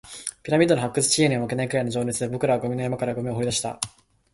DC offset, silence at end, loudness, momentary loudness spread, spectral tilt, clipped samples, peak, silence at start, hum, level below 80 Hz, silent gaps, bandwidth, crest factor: under 0.1%; 0.45 s; -24 LUFS; 10 LU; -4.5 dB/octave; under 0.1%; -4 dBFS; 0.05 s; none; -56 dBFS; none; 12 kHz; 20 dB